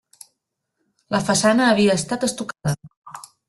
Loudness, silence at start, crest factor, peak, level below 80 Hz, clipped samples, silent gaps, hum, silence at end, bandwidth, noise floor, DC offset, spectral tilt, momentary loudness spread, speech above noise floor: -20 LUFS; 1.1 s; 18 dB; -4 dBFS; -56 dBFS; under 0.1%; 2.97-3.02 s; none; 0.3 s; 12.5 kHz; -77 dBFS; under 0.1%; -4.5 dB/octave; 22 LU; 58 dB